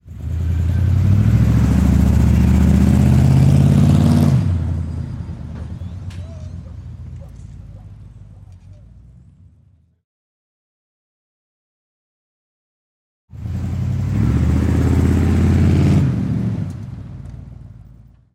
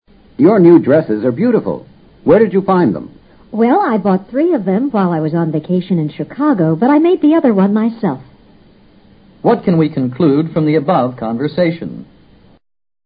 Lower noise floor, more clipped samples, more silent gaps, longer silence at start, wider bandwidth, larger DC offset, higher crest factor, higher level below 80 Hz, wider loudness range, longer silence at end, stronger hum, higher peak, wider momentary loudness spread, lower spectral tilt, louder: first, -53 dBFS vs -45 dBFS; neither; first, 10.04-13.28 s vs none; second, 0.05 s vs 0.4 s; first, 14 kHz vs 5 kHz; neither; about the same, 14 dB vs 14 dB; first, -28 dBFS vs -52 dBFS; first, 21 LU vs 3 LU; second, 0.55 s vs 1 s; neither; second, -4 dBFS vs 0 dBFS; first, 21 LU vs 10 LU; second, -8.5 dB/octave vs -13 dB/octave; about the same, -15 LUFS vs -13 LUFS